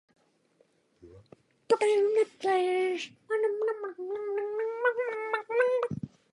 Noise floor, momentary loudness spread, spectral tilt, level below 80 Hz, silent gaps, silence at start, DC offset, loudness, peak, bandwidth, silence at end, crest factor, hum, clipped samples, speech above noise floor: -68 dBFS; 10 LU; -5 dB/octave; -72 dBFS; none; 1.05 s; under 0.1%; -29 LUFS; -12 dBFS; 11 kHz; 0.25 s; 18 dB; none; under 0.1%; 39 dB